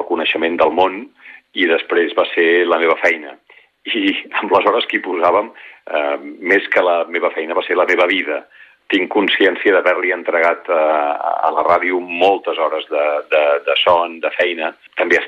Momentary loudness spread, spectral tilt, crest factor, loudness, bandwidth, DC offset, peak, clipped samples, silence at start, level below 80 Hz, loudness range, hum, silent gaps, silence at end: 8 LU; -4 dB/octave; 14 dB; -16 LUFS; 7.6 kHz; under 0.1%; -2 dBFS; under 0.1%; 0 s; -62 dBFS; 2 LU; none; none; 0 s